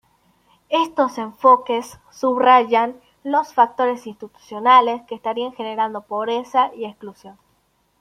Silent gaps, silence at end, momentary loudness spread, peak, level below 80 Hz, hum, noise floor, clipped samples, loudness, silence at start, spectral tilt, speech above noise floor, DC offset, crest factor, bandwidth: none; 0.7 s; 19 LU; -2 dBFS; -68 dBFS; none; -64 dBFS; under 0.1%; -19 LUFS; 0.7 s; -4 dB/octave; 45 dB; under 0.1%; 18 dB; 14 kHz